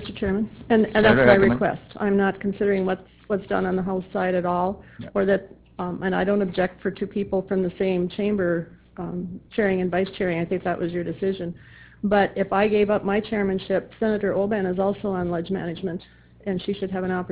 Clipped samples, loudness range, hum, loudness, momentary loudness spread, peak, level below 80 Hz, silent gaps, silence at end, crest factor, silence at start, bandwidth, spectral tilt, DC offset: under 0.1%; 5 LU; none; -24 LUFS; 11 LU; -2 dBFS; -48 dBFS; none; 0 s; 22 dB; 0 s; 4 kHz; -11 dB/octave; under 0.1%